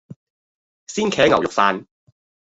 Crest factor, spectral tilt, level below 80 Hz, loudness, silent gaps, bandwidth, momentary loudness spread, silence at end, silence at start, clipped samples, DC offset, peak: 20 dB; -4 dB/octave; -56 dBFS; -19 LUFS; 0.16-0.86 s; 8 kHz; 13 LU; 0.6 s; 0.1 s; under 0.1%; under 0.1%; 0 dBFS